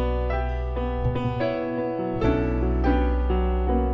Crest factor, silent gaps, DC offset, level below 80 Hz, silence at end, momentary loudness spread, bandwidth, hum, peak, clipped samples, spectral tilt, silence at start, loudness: 14 dB; none; under 0.1%; -26 dBFS; 0 s; 5 LU; 5.6 kHz; none; -10 dBFS; under 0.1%; -9.5 dB/octave; 0 s; -25 LUFS